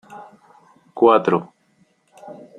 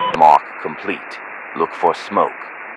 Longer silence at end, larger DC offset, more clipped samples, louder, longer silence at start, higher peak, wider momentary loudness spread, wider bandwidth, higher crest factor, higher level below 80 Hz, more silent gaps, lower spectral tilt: first, 0.25 s vs 0 s; neither; second, under 0.1% vs 0.3%; about the same, -17 LUFS vs -17 LUFS; about the same, 0.1 s vs 0 s; about the same, -2 dBFS vs 0 dBFS; first, 27 LU vs 18 LU; second, 9.6 kHz vs 11 kHz; about the same, 20 dB vs 18 dB; second, -66 dBFS vs -60 dBFS; neither; first, -7.5 dB/octave vs -5 dB/octave